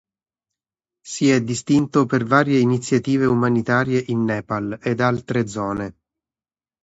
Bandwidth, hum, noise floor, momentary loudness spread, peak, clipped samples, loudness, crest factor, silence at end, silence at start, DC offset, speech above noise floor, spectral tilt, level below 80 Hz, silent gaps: 8 kHz; none; under -90 dBFS; 8 LU; -2 dBFS; under 0.1%; -20 LUFS; 18 dB; 0.9 s; 1.05 s; under 0.1%; over 71 dB; -6 dB/octave; -54 dBFS; none